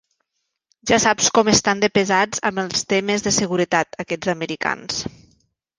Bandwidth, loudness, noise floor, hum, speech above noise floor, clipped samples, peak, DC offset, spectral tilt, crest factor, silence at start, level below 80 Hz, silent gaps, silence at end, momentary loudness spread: 10.5 kHz; -19 LUFS; -77 dBFS; none; 57 dB; under 0.1%; -2 dBFS; under 0.1%; -3 dB/octave; 18 dB; 0.85 s; -52 dBFS; none; 0.7 s; 10 LU